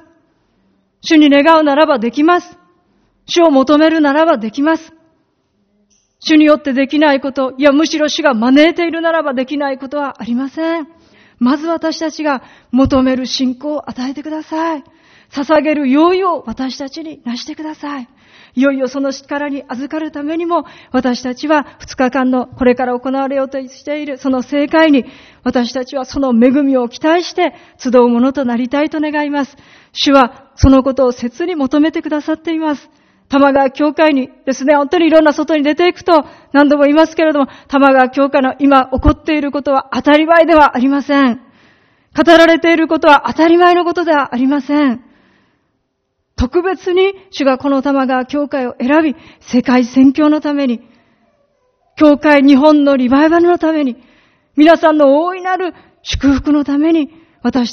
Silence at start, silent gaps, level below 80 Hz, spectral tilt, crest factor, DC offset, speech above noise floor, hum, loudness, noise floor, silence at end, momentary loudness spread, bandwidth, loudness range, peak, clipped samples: 1.05 s; none; -36 dBFS; -5.5 dB/octave; 12 dB; under 0.1%; 55 dB; none; -12 LUFS; -67 dBFS; 0 s; 13 LU; 6.6 kHz; 6 LU; 0 dBFS; 0.2%